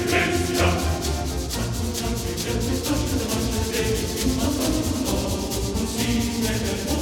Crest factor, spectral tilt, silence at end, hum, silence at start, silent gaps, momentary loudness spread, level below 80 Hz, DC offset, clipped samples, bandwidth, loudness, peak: 18 dB; -4.5 dB/octave; 0 s; none; 0 s; none; 5 LU; -32 dBFS; under 0.1%; under 0.1%; 19.5 kHz; -24 LUFS; -6 dBFS